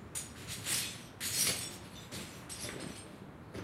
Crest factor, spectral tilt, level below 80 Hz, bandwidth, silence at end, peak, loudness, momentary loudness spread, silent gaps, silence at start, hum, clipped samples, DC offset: 22 dB; -1.5 dB/octave; -62 dBFS; 16 kHz; 0 s; -20 dBFS; -37 LUFS; 17 LU; none; 0 s; none; under 0.1%; under 0.1%